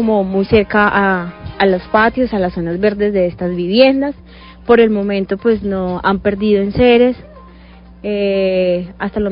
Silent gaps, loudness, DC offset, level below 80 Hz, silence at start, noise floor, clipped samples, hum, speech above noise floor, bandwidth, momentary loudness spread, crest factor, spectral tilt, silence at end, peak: none; -14 LUFS; under 0.1%; -38 dBFS; 0 s; -39 dBFS; under 0.1%; none; 25 dB; 5.4 kHz; 9 LU; 14 dB; -10.5 dB/octave; 0 s; 0 dBFS